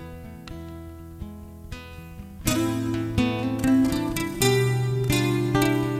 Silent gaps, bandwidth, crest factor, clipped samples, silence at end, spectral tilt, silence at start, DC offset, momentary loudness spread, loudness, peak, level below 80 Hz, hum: none; 16 kHz; 18 dB; under 0.1%; 0 s; -5.5 dB/octave; 0 s; under 0.1%; 19 LU; -23 LUFS; -6 dBFS; -42 dBFS; none